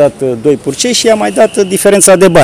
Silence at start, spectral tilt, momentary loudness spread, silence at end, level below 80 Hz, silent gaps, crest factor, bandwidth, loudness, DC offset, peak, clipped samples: 0 s; -3.5 dB/octave; 7 LU; 0 s; -40 dBFS; none; 8 dB; over 20 kHz; -8 LUFS; under 0.1%; 0 dBFS; 3%